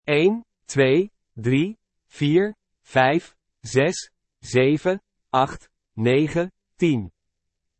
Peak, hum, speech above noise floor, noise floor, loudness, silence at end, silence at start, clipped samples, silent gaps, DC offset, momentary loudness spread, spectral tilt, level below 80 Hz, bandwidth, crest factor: -4 dBFS; none; 58 dB; -78 dBFS; -22 LUFS; 0.7 s; 0.05 s; under 0.1%; none; under 0.1%; 12 LU; -6 dB/octave; -58 dBFS; 8.8 kHz; 18 dB